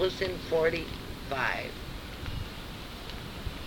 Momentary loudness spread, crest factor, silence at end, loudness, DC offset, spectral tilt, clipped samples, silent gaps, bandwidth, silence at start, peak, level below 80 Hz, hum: 13 LU; 20 dB; 0 s; -34 LUFS; under 0.1%; -5 dB/octave; under 0.1%; none; over 20 kHz; 0 s; -14 dBFS; -44 dBFS; none